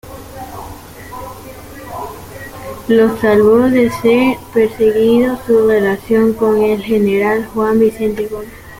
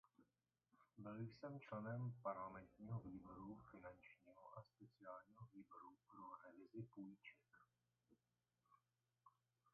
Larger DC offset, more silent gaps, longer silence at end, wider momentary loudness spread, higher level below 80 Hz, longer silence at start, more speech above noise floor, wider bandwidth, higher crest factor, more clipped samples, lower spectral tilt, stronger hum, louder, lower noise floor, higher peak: neither; neither; about the same, 0 s vs 0.05 s; first, 20 LU vs 14 LU; first, -42 dBFS vs -82 dBFS; second, 0.05 s vs 0.2 s; second, 20 dB vs over 34 dB; first, 16.5 kHz vs 4.5 kHz; second, 12 dB vs 22 dB; neither; about the same, -6.5 dB/octave vs -7.5 dB/octave; neither; first, -13 LUFS vs -57 LUFS; second, -32 dBFS vs under -90 dBFS; first, -2 dBFS vs -36 dBFS